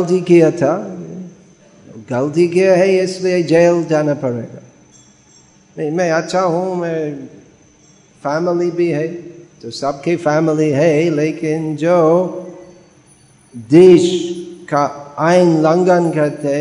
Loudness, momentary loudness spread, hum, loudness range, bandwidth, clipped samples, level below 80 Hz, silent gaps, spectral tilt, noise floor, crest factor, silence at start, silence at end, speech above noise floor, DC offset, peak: -14 LUFS; 15 LU; none; 7 LU; 10.5 kHz; under 0.1%; -60 dBFS; none; -6.5 dB/octave; -48 dBFS; 16 dB; 0 s; 0 s; 35 dB; under 0.1%; 0 dBFS